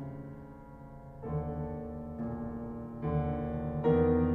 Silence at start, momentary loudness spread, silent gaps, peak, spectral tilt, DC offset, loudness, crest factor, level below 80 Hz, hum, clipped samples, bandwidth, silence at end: 0 s; 22 LU; none; -14 dBFS; -11.5 dB/octave; under 0.1%; -34 LUFS; 18 dB; -46 dBFS; none; under 0.1%; 4.1 kHz; 0 s